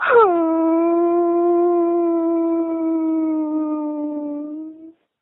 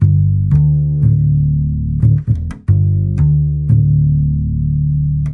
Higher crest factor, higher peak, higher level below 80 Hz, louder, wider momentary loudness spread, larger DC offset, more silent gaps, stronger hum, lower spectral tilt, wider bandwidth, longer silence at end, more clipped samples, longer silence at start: about the same, 14 dB vs 12 dB; second, -4 dBFS vs 0 dBFS; second, -66 dBFS vs -24 dBFS; second, -19 LUFS vs -14 LUFS; first, 11 LU vs 5 LU; neither; neither; neither; second, -4 dB/octave vs -12 dB/octave; first, 4 kHz vs 2.1 kHz; first, 0.3 s vs 0 s; neither; about the same, 0 s vs 0 s